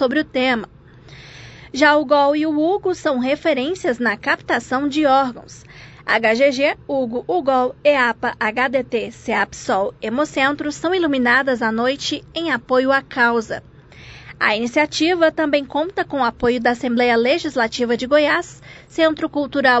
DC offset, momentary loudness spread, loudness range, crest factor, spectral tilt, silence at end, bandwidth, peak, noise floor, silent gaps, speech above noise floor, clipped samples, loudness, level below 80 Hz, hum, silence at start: under 0.1%; 8 LU; 2 LU; 18 dB; -4 dB/octave; 0 s; 8.4 kHz; -2 dBFS; -42 dBFS; none; 24 dB; under 0.1%; -18 LUFS; -50 dBFS; none; 0 s